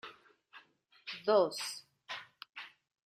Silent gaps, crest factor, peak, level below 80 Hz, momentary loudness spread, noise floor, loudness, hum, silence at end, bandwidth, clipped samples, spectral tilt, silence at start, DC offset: 2.49-2.53 s; 22 dB; -16 dBFS; -84 dBFS; 20 LU; -64 dBFS; -35 LUFS; none; 0.4 s; 14.5 kHz; under 0.1%; -3 dB/octave; 0.05 s; under 0.1%